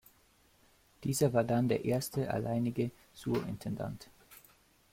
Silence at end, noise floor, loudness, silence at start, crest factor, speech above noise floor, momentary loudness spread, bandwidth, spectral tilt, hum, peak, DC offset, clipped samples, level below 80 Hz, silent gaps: 0.55 s; -67 dBFS; -34 LUFS; 1 s; 18 dB; 34 dB; 12 LU; 16.5 kHz; -6 dB/octave; none; -16 dBFS; under 0.1%; under 0.1%; -62 dBFS; none